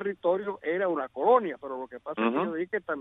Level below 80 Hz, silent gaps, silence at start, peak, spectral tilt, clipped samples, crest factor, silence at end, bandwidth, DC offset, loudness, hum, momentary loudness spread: -72 dBFS; none; 0 s; -10 dBFS; -8.5 dB/octave; under 0.1%; 18 dB; 0 s; 4 kHz; under 0.1%; -29 LUFS; none; 13 LU